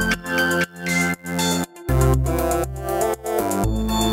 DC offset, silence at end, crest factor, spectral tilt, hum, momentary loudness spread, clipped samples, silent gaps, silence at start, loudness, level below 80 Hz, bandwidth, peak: under 0.1%; 0 s; 16 dB; -4.5 dB/octave; none; 4 LU; under 0.1%; none; 0 s; -21 LUFS; -30 dBFS; 16.5 kHz; -6 dBFS